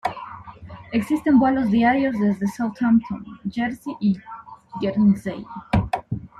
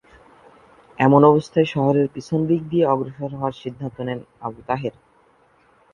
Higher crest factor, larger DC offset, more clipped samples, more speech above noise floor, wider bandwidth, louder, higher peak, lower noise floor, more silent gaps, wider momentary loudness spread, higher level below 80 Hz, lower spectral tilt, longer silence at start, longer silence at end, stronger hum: about the same, 16 dB vs 20 dB; neither; neither; second, 20 dB vs 38 dB; first, 12.5 kHz vs 10 kHz; about the same, -22 LUFS vs -20 LUFS; second, -6 dBFS vs 0 dBFS; second, -40 dBFS vs -57 dBFS; neither; first, 20 LU vs 17 LU; first, -44 dBFS vs -56 dBFS; about the same, -7.5 dB/octave vs -8.5 dB/octave; second, 0.05 s vs 1 s; second, 0.15 s vs 1.05 s; neither